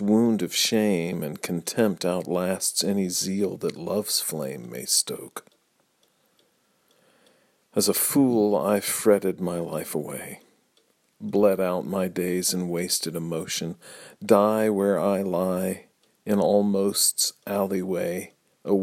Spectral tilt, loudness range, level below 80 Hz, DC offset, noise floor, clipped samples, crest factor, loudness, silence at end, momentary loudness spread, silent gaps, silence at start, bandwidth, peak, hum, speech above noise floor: -4 dB/octave; 5 LU; -68 dBFS; under 0.1%; -68 dBFS; under 0.1%; 22 dB; -24 LUFS; 0 s; 14 LU; none; 0 s; 16.5 kHz; -4 dBFS; none; 43 dB